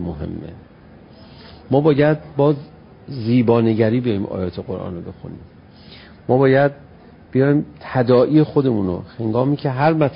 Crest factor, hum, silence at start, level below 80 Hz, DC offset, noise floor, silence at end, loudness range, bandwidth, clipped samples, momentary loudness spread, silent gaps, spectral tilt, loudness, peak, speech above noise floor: 16 dB; none; 0 s; -46 dBFS; under 0.1%; -43 dBFS; 0 s; 4 LU; 5.4 kHz; under 0.1%; 16 LU; none; -13 dB/octave; -18 LUFS; -2 dBFS; 26 dB